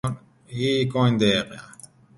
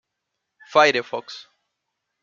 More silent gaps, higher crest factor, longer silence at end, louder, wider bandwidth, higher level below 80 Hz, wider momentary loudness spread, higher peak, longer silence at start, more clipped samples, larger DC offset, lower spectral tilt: neither; about the same, 18 dB vs 22 dB; second, 0.5 s vs 0.8 s; second, -22 LUFS vs -19 LUFS; first, 11.5 kHz vs 7.4 kHz; first, -54 dBFS vs -78 dBFS; second, 18 LU vs 22 LU; second, -6 dBFS vs -2 dBFS; second, 0.05 s vs 0.7 s; neither; neither; first, -6 dB/octave vs -3 dB/octave